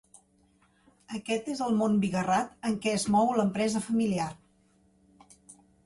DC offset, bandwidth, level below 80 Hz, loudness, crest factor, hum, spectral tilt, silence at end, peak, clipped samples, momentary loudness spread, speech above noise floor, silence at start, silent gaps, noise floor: under 0.1%; 11.5 kHz; -64 dBFS; -28 LUFS; 16 dB; none; -5.5 dB/octave; 0.3 s; -14 dBFS; under 0.1%; 8 LU; 38 dB; 1.1 s; none; -66 dBFS